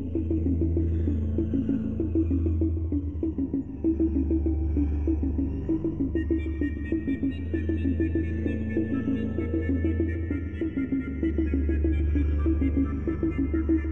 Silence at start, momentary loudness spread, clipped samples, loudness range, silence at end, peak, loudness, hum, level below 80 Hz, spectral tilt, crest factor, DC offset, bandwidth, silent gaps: 0 s; 4 LU; under 0.1%; 1 LU; 0 s; -14 dBFS; -28 LUFS; none; -34 dBFS; -11 dB/octave; 12 dB; 0.5%; 3.7 kHz; none